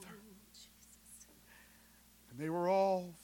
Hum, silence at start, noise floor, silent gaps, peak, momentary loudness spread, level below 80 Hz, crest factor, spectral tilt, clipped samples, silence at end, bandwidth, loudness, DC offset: 60 Hz at -70 dBFS; 0 s; -64 dBFS; none; -22 dBFS; 27 LU; -72 dBFS; 20 dB; -6 dB/octave; under 0.1%; 0.05 s; 17.5 kHz; -35 LUFS; under 0.1%